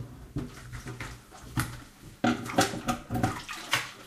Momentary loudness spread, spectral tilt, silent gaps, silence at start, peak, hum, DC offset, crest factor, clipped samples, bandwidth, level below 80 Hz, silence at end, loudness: 15 LU; -4 dB/octave; none; 0 s; -10 dBFS; none; under 0.1%; 22 dB; under 0.1%; 15.5 kHz; -50 dBFS; 0 s; -32 LUFS